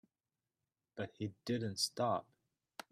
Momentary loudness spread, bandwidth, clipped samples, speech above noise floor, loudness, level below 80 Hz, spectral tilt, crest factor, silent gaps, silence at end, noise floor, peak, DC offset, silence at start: 19 LU; 15.5 kHz; under 0.1%; over 51 dB; -39 LUFS; -80 dBFS; -4 dB/octave; 20 dB; none; 0.7 s; under -90 dBFS; -22 dBFS; under 0.1%; 0.95 s